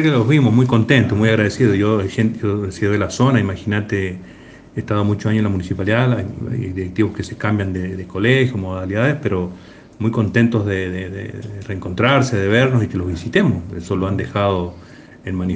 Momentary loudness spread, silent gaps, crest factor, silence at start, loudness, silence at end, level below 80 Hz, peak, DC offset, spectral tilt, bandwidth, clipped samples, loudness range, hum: 12 LU; none; 18 dB; 0 s; -18 LUFS; 0 s; -50 dBFS; 0 dBFS; under 0.1%; -7 dB/octave; 9.2 kHz; under 0.1%; 4 LU; none